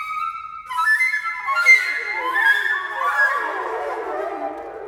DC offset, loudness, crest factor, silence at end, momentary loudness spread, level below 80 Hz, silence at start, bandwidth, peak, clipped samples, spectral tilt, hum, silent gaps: under 0.1%; -19 LUFS; 18 dB; 0 s; 15 LU; -64 dBFS; 0 s; 19.5 kHz; -4 dBFS; under 0.1%; -0.5 dB/octave; none; none